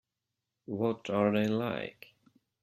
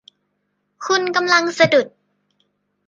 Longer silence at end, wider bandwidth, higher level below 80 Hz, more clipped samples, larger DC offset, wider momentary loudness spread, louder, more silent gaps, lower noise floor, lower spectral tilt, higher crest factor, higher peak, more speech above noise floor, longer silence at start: second, 0.7 s vs 1 s; first, 13 kHz vs 9.4 kHz; second, -72 dBFS vs -64 dBFS; neither; neither; about the same, 12 LU vs 14 LU; second, -32 LUFS vs -16 LUFS; neither; first, -87 dBFS vs -71 dBFS; first, -7.5 dB/octave vs -3.5 dB/octave; about the same, 20 dB vs 20 dB; second, -14 dBFS vs -2 dBFS; about the same, 56 dB vs 55 dB; about the same, 0.7 s vs 0.8 s